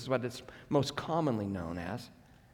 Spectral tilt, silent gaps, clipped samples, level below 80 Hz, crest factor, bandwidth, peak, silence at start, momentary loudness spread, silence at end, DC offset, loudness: -6 dB/octave; none; under 0.1%; -64 dBFS; 20 dB; 18 kHz; -16 dBFS; 0 s; 12 LU; 0.4 s; under 0.1%; -35 LUFS